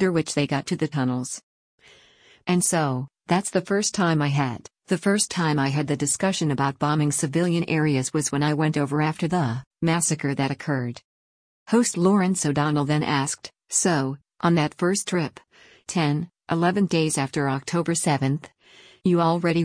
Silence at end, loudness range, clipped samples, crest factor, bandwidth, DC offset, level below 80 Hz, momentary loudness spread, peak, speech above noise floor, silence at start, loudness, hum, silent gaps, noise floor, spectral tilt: 0 s; 2 LU; under 0.1%; 16 dB; 10.5 kHz; under 0.1%; -60 dBFS; 8 LU; -8 dBFS; 33 dB; 0 s; -23 LUFS; none; 1.43-1.78 s, 9.67-9.71 s, 11.04-11.66 s; -55 dBFS; -5 dB/octave